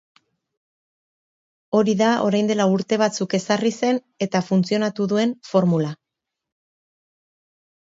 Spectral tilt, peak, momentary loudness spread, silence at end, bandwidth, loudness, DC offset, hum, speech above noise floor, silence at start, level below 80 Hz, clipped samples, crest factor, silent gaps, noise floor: -6 dB/octave; -4 dBFS; 6 LU; 1.95 s; 7.8 kHz; -21 LUFS; under 0.1%; none; 64 dB; 1.7 s; -68 dBFS; under 0.1%; 18 dB; none; -83 dBFS